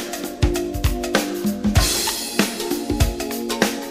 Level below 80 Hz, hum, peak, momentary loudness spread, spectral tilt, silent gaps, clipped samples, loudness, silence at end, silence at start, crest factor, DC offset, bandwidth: -28 dBFS; none; 0 dBFS; 6 LU; -4 dB/octave; none; under 0.1%; -21 LUFS; 0 s; 0 s; 20 dB; under 0.1%; 16 kHz